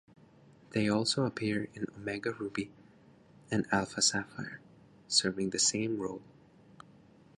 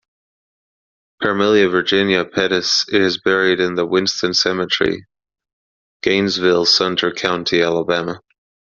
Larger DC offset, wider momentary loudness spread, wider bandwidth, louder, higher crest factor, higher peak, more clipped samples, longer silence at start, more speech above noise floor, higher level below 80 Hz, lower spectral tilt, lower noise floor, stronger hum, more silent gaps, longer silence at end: neither; first, 14 LU vs 7 LU; first, 11.5 kHz vs 7.4 kHz; second, -32 LUFS vs -16 LUFS; about the same, 22 dB vs 18 dB; second, -12 dBFS vs 0 dBFS; neither; second, 0.7 s vs 1.2 s; second, 27 dB vs over 74 dB; second, -66 dBFS vs -56 dBFS; about the same, -3 dB/octave vs -2 dB/octave; second, -60 dBFS vs under -90 dBFS; neither; second, none vs 5.53-6.00 s; first, 1.15 s vs 0.55 s